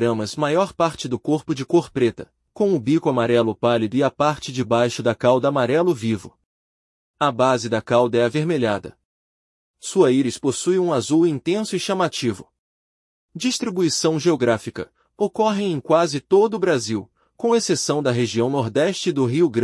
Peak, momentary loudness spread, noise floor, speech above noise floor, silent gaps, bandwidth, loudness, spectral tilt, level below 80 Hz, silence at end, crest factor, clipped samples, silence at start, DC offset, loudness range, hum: -4 dBFS; 7 LU; under -90 dBFS; over 70 dB; 6.46-7.14 s, 9.05-9.74 s, 12.59-13.29 s; 12 kHz; -20 LUFS; -5 dB/octave; -62 dBFS; 0 s; 18 dB; under 0.1%; 0 s; under 0.1%; 3 LU; none